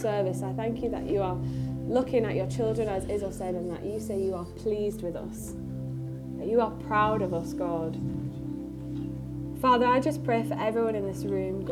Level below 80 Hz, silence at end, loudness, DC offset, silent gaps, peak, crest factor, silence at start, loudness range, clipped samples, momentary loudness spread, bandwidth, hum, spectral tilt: -48 dBFS; 0 s; -30 LUFS; under 0.1%; none; -12 dBFS; 18 dB; 0 s; 4 LU; under 0.1%; 11 LU; 15.5 kHz; none; -7 dB/octave